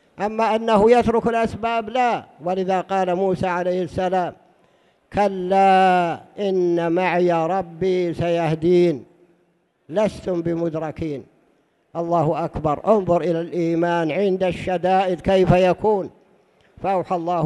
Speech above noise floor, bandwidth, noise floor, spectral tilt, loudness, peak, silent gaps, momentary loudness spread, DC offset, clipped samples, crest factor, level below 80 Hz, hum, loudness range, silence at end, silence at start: 44 dB; 11 kHz; -64 dBFS; -7 dB/octave; -20 LUFS; -4 dBFS; none; 10 LU; under 0.1%; under 0.1%; 18 dB; -46 dBFS; none; 4 LU; 0 s; 0.2 s